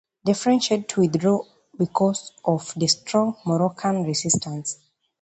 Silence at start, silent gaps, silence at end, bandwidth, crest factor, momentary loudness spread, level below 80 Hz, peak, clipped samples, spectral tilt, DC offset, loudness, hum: 0.25 s; none; 0.5 s; 9 kHz; 18 dB; 8 LU; -62 dBFS; -4 dBFS; under 0.1%; -4.5 dB/octave; under 0.1%; -23 LUFS; none